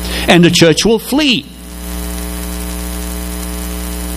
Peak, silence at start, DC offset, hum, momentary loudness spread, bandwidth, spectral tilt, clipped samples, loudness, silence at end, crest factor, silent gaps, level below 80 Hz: 0 dBFS; 0 s; under 0.1%; none; 15 LU; 16 kHz; -4.5 dB/octave; 0.3%; -13 LUFS; 0 s; 14 dB; none; -26 dBFS